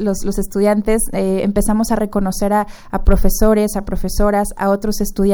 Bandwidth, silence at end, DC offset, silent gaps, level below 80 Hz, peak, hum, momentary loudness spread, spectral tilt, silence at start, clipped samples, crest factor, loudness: over 20 kHz; 0 s; under 0.1%; none; -22 dBFS; 0 dBFS; none; 6 LU; -6 dB/octave; 0 s; under 0.1%; 14 dB; -17 LUFS